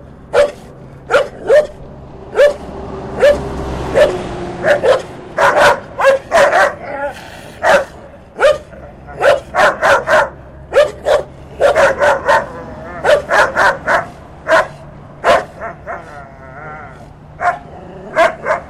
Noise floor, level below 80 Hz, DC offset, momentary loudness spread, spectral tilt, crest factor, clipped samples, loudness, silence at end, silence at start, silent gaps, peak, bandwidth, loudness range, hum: -35 dBFS; -38 dBFS; under 0.1%; 21 LU; -4 dB/octave; 14 dB; under 0.1%; -13 LUFS; 0 s; 0.05 s; none; 0 dBFS; 14 kHz; 6 LU; none